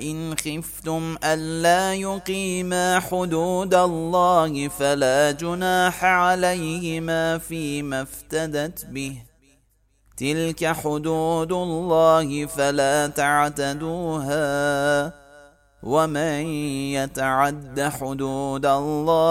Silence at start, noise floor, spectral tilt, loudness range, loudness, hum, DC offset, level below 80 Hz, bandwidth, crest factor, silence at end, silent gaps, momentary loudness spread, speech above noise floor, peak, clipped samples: 0 s; -63 dBFS; -4.5 dB/octave; 7 LU; -22 LUFS; none; under 0.1%; -50 dBFS; 16 kHz; 20 dB; 0 s; none; 9 LU; 41 dB; -2 dBFS; under 0.1%